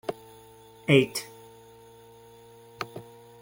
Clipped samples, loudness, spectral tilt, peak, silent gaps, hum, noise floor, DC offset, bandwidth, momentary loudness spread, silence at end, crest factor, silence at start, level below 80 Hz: under 0.1%; -27 LUFS; -5.5 dB/octave; -6 dBFS; none; none; -52 dBFS; under 0.1%; 17 kHz; 28 LU; 0.4 s; 24 dB; 0.1 s; -68 dBFS